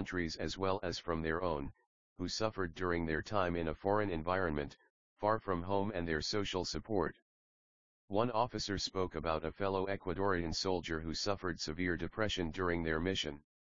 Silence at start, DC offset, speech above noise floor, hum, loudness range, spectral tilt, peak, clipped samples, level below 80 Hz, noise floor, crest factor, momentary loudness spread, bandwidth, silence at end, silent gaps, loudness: 0 s; 0.2%; over 53 dB; none; 2 LU; -4 dB/octave; -16 dBFS; under 0.1%; -54 dBFS; under -90 dBFS; 20 dB; 4 LU; 7.4 kHz; 0.25 s; 1.87-2.16 s, 4.90-5.16 s, 7.22-8.08 s; -37 LUFS